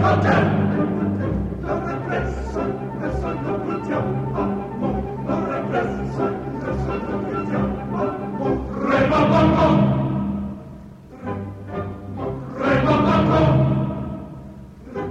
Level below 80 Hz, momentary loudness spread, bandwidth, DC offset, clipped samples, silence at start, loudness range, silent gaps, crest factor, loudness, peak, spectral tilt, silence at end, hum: -36 dBFS; 15 LU; 8 kHz; under 0.1%; under 0.1%; 0 s; 5 LU; none; 16 dB; -22 LUFS; -6 dBFS; -8.5 dB/octave; 0 s; none